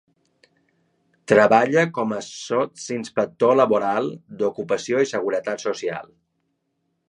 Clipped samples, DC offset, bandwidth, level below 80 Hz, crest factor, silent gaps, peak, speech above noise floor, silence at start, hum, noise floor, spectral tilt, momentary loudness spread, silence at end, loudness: under 0.1%; under 0.1%; 10.5 kHz; -70 dBFS; 20 dB; none; -2 dBFS; 53 dB; 1.3 s; none; -73 dBFS; -5 dB/octave; 13 LU; 1.05 s; -21 LUFS